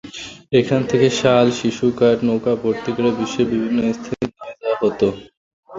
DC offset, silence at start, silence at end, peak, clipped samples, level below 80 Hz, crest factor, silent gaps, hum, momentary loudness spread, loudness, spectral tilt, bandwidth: under 0.1%; 0.05 s; 0 s; -2 dBFS; under 0.1%; -52 dBFS; 16 dB; 5.37-5.63 s; none; 11 LU; -18 LUFS; -6 dB/octave; 7.8 kHz